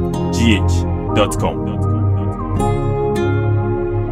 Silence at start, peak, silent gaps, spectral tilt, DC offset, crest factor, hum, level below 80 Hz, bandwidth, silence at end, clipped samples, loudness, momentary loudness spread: 0 s; 0 dBFS; none; -6.5 dB/octave; under 0.1%; 16 dB; none; -28 dBFS; 13.5 kHz; 0 s; under 0.1%; -17 LUFS; 5 LU